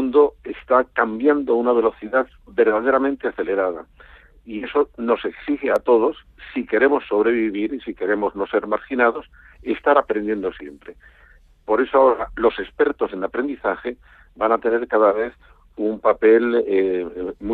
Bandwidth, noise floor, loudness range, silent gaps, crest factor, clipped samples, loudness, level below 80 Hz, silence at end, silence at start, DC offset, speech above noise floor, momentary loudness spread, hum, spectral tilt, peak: 4.4 kHz; -51 dBFS; 3 LU; none; 18 dB; under 0.1%; -20 LUFS; -50 dBFS; 0 s; 0 s; under 0.1%; 31 dB; 12 LU; none; -7.5 dB/octave; -2 dBFS